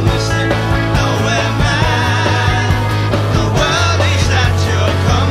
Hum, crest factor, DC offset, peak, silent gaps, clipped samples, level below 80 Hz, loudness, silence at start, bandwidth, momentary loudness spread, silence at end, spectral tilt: none; 12 dB; under 0.1%; 0 dBFS; none; under 0.1%; -24 dBFS; -14 LUFS; 0 s; 14 kHz; 2 LU; 0 s; -5 dB/octave